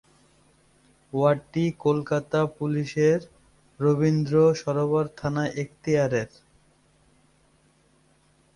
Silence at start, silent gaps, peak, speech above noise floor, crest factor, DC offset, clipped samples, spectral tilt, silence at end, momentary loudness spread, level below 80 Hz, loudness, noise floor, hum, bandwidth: 1.15 s; none; -8 dBFS; 39 dB; 18 dB; under 0.1%; under 0.1%; -7.5 dB/octave; 2.3 s; 7 LU; -60 dBFS; -24 LUFS; -62 dBFS; none; 11 kHz